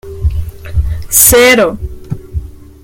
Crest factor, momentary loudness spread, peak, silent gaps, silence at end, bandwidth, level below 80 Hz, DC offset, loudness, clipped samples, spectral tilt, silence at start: 12 dB; 21 LU; 0 dBFS; none; 0.2 s; over 20 kHz; -22 dBFS; under 0.1%; -9 LUFS; 0.6%; -3 dB/octave; 0.05 s